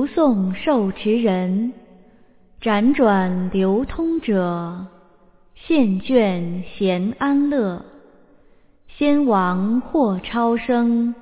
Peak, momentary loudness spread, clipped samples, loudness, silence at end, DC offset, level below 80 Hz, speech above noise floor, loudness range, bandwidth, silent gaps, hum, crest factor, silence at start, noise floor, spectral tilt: -2 dBFS; 9 LU; under 0.1%; -19 LUFS; 0 s; under 0.1%; -48 dBFS; 35 dB; 1 LU; 4 kHz; none; none; 16 dB; 0 s; -54 dBFS; -11.5 dB/octave